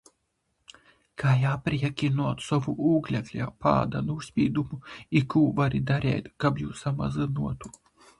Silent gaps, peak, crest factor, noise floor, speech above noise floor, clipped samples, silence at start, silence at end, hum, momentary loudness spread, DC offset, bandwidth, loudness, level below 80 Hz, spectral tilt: none; -8 dBFS; 20 dB; -76 dBFS; 49 dB; under 0.1%; 1.2 s; 0.5 s; none; 8 LU; under 0.1%; 11.5 kHz; -27 LUFS; -50 dBFS; -7.5 dB/octave